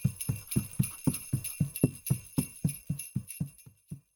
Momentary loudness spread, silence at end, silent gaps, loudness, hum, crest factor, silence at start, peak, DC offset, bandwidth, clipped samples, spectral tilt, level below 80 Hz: 9 LU; 0.15 s; none; -34 LUFS; none; 24 dB; 0 s; -10 dBFS; under 0.1%; over 20 kHz; under 0.1%; -5.5 dB/octave; -54 dBFS